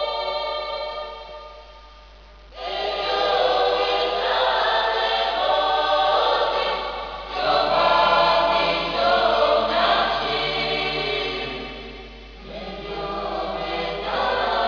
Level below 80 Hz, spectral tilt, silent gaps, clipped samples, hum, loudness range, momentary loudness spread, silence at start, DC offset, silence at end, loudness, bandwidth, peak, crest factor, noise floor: -44 dBFS; -4 dB/octave; none; under 0.1%; none; 8 LU; 16 LU; 0 s; under 0.1%; 0 s; -21 LUFS; 5.4 kHz; -6 dBFS; 16 dB; -45 dBFS